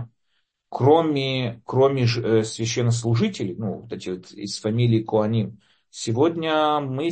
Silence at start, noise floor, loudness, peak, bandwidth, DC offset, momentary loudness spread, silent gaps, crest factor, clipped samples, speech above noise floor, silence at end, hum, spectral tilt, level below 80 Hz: 0 s; -73 dBFS; -22 LUFS; -4 dBFS; 8.8 kHz; under 0.1%; 13 LU; none; 18 dB; under 0.1%; 51 dB; 0 s; none; -6 dB/octave; -60 dBFS